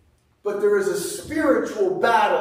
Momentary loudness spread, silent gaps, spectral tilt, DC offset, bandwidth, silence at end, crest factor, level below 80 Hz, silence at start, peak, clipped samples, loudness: 9 LU; none; -4 dB/octave; under 0.1%; 16 kHz; 0 s; 16 dB; -56 dBFS; 0.45 s; -6 dBFS; under 0.1%; -21 LUFS